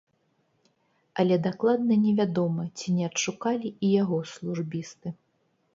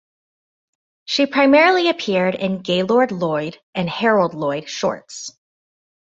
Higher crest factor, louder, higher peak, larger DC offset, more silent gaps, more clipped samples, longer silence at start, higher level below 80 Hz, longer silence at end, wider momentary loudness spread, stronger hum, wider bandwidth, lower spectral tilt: about the same, 16 dB vs 18 dB; second, -26 LUFS vs -18 LUFS; second, -10 dBFS vs -2 dBFS; neither; second, none vs 3.63-3.73 s; neither; about the same, 1.15 s vs 1.1 s; second, -72 dBFS vs -64 dBFS; second, 0.6 s vs 0.75 s; about the same, 12 LU vs 14 LU; neither; about the same, 7.8 kHz vs 8 kHz; about the same, -6 dB/octave vs -5 dB/octave